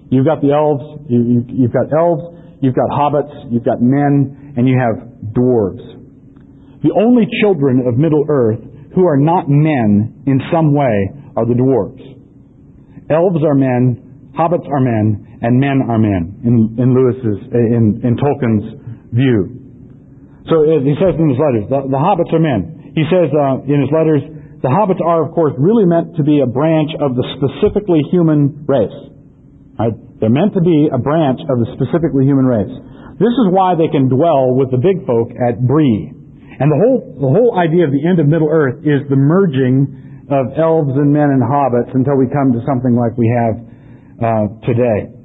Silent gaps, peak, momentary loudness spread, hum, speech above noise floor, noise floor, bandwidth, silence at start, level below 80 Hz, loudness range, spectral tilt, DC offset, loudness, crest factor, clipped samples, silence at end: none; -2 dBFS; 7 LU; none; 29 dB; -42 dBFS; 4 kHz; 0.1 s; -44 dBFS; 3 LU; -12.5 dB/octave; under 0.1%; -14 LUFS; 12 dB; under 0.1%; 0.1 s